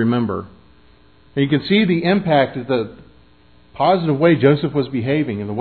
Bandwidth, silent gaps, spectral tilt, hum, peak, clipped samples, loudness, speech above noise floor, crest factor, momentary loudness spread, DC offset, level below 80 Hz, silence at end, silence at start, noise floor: 4.6 kHz; none; -10.5 dB/octave; none; 0 dBFS; under 0.1%; -18 LUFS; 35 dB; 18 dB; 8 LU; 0.2%; -52 dBFS; 0 s; 0 s; -51 dBFS